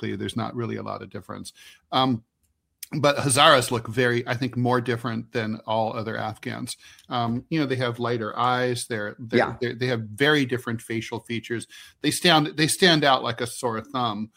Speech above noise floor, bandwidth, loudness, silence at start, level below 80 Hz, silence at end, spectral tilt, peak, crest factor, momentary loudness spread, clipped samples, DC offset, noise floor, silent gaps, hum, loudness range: 48 dB; 16 kHz; -24 LUFS; 0 s; -62 dBFS; 0.1 s; -4 dB/octave; -2 dBFS; 24 dB; 15 LU; under 0.1%; under 0.1%; -72 dBFS; none; none; 6 LU